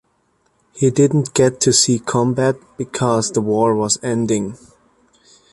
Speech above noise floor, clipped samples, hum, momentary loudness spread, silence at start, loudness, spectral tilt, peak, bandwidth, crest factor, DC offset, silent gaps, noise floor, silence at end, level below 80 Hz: 46 dB; under 0.1%; none; 8 LU; 0.75 s; -17 LUFS; -4.5 dB/octave; 0 dBFS; 11.5 kHz; 18 dB; under 0.1%; none; -63 dBFS; 1 s; -54 dBFS